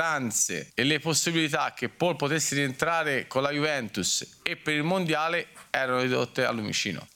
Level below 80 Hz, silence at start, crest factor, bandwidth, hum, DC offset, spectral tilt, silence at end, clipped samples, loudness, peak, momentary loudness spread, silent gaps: -66 dBFS; 0 s; 22 dB; 18 kHz; none; under 0.1%; -3 dB/octave; 0.1 s; under 0.1%; -27 LUFS; -6 dBFS; 4 LU; none